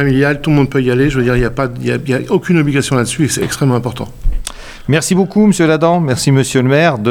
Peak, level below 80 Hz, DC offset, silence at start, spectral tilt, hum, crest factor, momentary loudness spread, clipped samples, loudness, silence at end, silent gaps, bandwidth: 0 dBFS; -26 dBFS; under 0.1%; 0 s; -5.5 dB/octave; none; 12 dB; 12 LU; under 0.1%; -13 LUFS; 0 s; none; 16.5 kHz